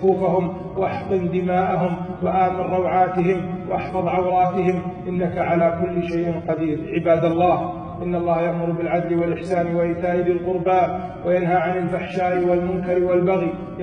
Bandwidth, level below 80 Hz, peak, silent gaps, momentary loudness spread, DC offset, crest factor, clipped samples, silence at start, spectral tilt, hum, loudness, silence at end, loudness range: 6.4 kHz; -46 dBFS; -6 dBFS; none; 6 LU; under 0.1%; 14 dB; under 0.1%; 0 s; -9 dB/octave; none; -21 LUFS; 0 s; 1 LU